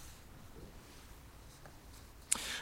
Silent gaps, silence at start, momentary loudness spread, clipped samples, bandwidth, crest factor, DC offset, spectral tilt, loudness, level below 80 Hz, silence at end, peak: none; 0 s; 20 LU; under 0.1%; 16 kHz; 38 dB; under 0.1%; -1 dB/octave; -38 LUFS; -58 dBFS; 0 s; -8 dBFS